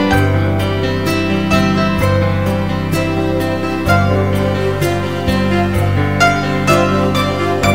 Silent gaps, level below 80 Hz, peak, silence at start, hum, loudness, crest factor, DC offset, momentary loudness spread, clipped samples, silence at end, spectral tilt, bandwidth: none; -32 dBFS; 0 dBFS; 0 s; none; -15 LUFS; 14 dB; 2%; 4 LU; under 0.1%; 0 s; -6 dB/octave; 16.5 kHz